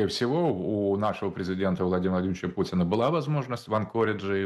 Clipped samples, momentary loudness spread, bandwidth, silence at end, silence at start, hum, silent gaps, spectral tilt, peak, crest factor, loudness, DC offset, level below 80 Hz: under 0.1%; 5 LU; 12.5 kHz; 0 s; 0 s; none; none; -7 dB/octave; -12 dBFS; 14 dB; -27 LUFS; under 0.1%; -58 dBFS